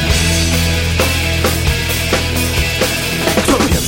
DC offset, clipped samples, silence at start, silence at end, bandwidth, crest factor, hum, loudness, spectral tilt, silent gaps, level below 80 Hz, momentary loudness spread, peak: under 0.1%; under 0.1%; 0 s; 0 s; 16.5 kHz; 14 dB; none; -14 LUFS; -4 dB/octave; none; -22 dBFS; 3 LU; 0 dBFS